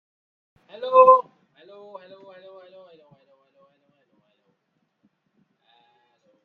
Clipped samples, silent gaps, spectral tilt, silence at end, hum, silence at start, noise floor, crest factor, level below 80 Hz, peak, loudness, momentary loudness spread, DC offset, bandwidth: under 0.1%; none; -6 dB/octave; 5.25 s; none; 0.8 s; -74 dBFS; 24 dB; -78 dBFS; -2 dBFS; -16 LUFS; 30 LU; under 0.1%; 4.4 kHz